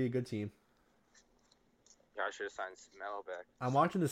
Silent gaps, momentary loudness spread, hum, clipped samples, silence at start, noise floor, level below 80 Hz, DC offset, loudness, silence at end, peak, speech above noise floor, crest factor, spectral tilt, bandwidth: none; 15 LU; none; under 0.1%; 0 s; -72 dBFS; -76 dBFS; under 0.1%; -38 LUFS; 0 s; -18 dBFS; 35 dB; 22 dB; -6.5 dB/octave; 14 kHz